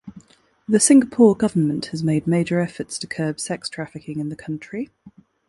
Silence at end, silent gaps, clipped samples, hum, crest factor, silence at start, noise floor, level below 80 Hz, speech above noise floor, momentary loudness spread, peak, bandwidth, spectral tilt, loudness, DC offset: 0.4 s; none; under 0.1%; none; 20 dB; 0.05 s; -53 dBFS; -58 dBFS; 33 dB; 18 LU; -2 dBFS; 11.5 kHz; -5 dB/octave; -20 LUFS; under 0.1%